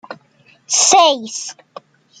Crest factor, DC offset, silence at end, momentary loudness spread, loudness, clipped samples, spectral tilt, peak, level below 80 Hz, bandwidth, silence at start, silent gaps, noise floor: 18 dB; under 0.1%; 0.7 s; 17 LU; -12 LUFS; under 0.1%; 0.5 dB/octave; 0 dBFS; -72 dBFS; 10.5 kHz; 0.1 s; none; -53 dBFS